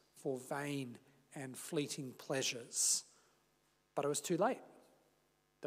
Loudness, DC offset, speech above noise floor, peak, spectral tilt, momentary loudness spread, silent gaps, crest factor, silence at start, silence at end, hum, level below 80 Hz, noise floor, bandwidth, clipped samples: -39 LUFS; under 0.1%; 37 dB; -22 dBFS; -3 dB/octave; 14 LU; none; 20 dB; 0.15 s; 0 s; 50 Hz at -70 dBFS; under -90 dBFS; -77 dBFS; 16 kHz; under 0.1%